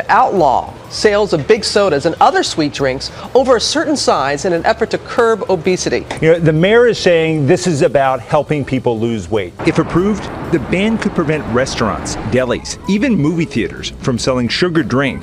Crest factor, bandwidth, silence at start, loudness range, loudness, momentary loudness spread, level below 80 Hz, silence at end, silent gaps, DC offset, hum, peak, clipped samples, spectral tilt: 14 dB; 13.5 kHz; 0 s; 4 LU; -14 LUFS; 7 LU; -38 dBFS; 0 s; none; under 0.1%; none; 0 dBFS; under 0.1%; -5 dB/octave